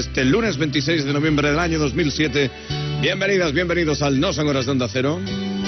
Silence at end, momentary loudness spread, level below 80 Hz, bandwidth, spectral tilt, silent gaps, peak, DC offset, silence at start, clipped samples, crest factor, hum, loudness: 0 s; 4 LU; -38 dBFS; 6.4 kHz; -4.5 dB/octave; none; -8 dBFS; under 0.1%; 0 s; under 0.1%; 12 dB; none; -20 LUFS